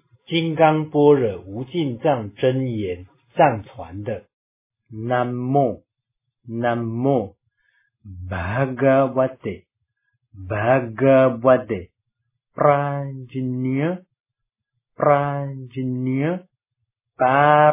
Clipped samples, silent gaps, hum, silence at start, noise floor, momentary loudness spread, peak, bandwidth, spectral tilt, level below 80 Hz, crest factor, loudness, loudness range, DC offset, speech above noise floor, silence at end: under 0.1%; 4.33-4.70 s, 14.20-14.24 s; none; 0.3 s; -81 dBFS; 16 LU; -2 dBFS; 3.8 kHz; -11 dB/octave; -50 dBFS; 18 dB; -20 LUFS; 5 LU; under 0.1%; 62 dB; 0 s